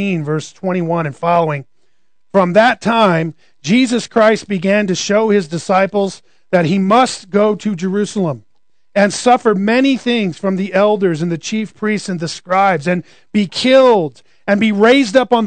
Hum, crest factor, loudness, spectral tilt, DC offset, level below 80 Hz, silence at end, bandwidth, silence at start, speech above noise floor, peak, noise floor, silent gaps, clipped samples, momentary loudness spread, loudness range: none; 14 dB; -14 LUFS; -5.5 dB/octave; 0.4%; -62 dBFS; 0 s; 9.4 kHz; 0 s; 55 dB; 0 dBFS; -68 dBFS; none; under 0.1%; 9 LU; 2 LU